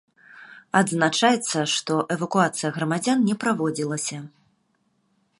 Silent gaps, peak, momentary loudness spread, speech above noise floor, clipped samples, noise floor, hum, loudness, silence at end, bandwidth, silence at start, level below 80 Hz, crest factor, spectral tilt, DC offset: none; -4 dBFS; 7 LU; 46 dB; under 0.1%; -69 dBFS; none; -23 LUFS; 1.1 s; 11.5 kHz; 0.35 s; -72 dBFS; 22 dB; -4 dB/octave; under 0.1%